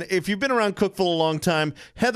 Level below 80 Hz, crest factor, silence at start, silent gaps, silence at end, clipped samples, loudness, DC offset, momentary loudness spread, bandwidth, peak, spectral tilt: -56 dBFS; 16 dB; 0 s; none; 0 s; under 0.1%; -23 LUFS; under 0.1%; 3 LU; 15.5 kHz; -6 dBFS; -5 dB/octave